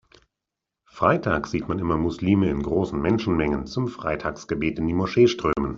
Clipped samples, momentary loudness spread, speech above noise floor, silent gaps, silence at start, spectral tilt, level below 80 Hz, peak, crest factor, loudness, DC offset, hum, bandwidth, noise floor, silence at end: under 0.1%; 8 LU; 63 dB; none; 0.95 s; -7 dB/octave; -44 dBFS; -4 dBFS; 20 dB; -23 LUFS; under 0.1%; none; 7.4 kHz; -86 dBFS; 0 s